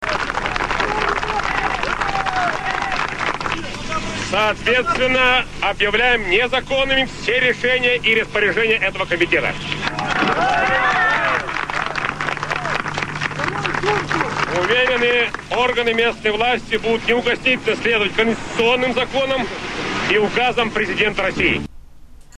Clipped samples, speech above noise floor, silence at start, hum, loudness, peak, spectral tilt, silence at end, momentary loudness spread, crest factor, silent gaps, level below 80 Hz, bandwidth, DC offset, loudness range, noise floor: under 0.1%; 21 dB; 0 s; none; -18 LUFS; -2 dBFS; -4 dB/octave; 0.2 s; 6 LU; 18 dB; none; -38 dBFS; 12.5 kHz; under 0.1%; 4 LU; -39 dBFS